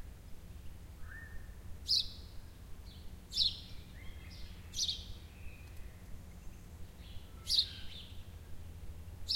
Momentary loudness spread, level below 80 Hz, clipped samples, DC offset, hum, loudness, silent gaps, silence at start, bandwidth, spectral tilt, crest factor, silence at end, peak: 22 LU; -52 dBFS; under 0.1%; under 0.1%; none; -35 LUFS; none; 0 s; 16.5 kHz; -1.5 dB/octave; 26 dB; 0 s; -16 dBFS